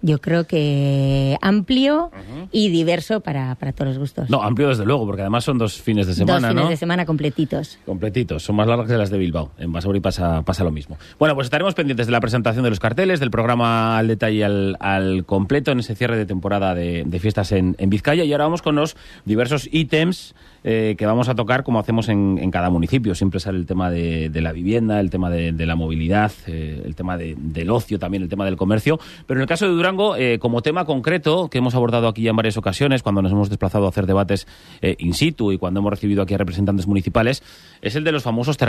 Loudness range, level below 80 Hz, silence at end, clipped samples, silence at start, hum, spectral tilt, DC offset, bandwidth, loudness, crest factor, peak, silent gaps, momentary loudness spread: 3 LU; -42 dBFS; 0 s; under 0.1%; 0 s; none; -7 dB/octave; under 0.1%; 14 kHz; -20 LUFS; 16 dB; -4 dBFS; none; 7 LU